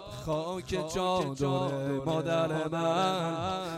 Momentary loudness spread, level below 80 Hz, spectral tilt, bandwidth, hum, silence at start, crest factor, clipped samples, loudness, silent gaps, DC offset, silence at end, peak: 5 LU; -56 dBFS; -5.5 dB/octave; 15.5 kHz; none; 0 s; 14 dB; under 0.1%; -31 LUFS; none; under 0.1%; 0 s; -16 dBFS